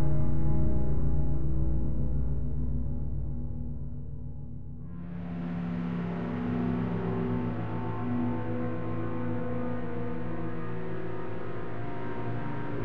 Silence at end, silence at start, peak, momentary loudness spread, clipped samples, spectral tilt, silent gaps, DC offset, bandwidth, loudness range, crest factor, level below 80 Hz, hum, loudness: 0 s; 0 s; -14 dBFS; 9 LU; under 0.1%; -11 dB/octave; none; 3%; 4.7 kHz; 5 LU; 14 dB; -38 dBFS; none; -34 LUFS